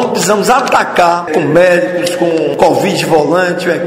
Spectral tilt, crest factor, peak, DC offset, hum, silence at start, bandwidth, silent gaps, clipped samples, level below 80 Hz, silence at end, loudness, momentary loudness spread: -4.5 dB/octave; 10 dB; 0 dBFS; under 0.1%; none; 0 s; 16.5 kHz; none; 0.2%; -48 dBFS; 0 s; -10 LUFS; 4 LU